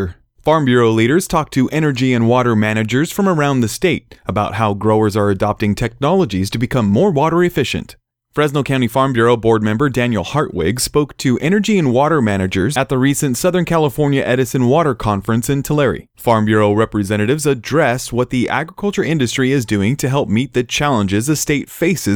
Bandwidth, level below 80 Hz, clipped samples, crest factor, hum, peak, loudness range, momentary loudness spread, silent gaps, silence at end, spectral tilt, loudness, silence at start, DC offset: 19.5 kHz; -40 dBFS; under 0.1%; 14 dB; none; -2 dBFS; 2 LU; 5 LU; none; 0 s; -5.5 dB/octave; -16 LUFS; 0 s; under 0.1%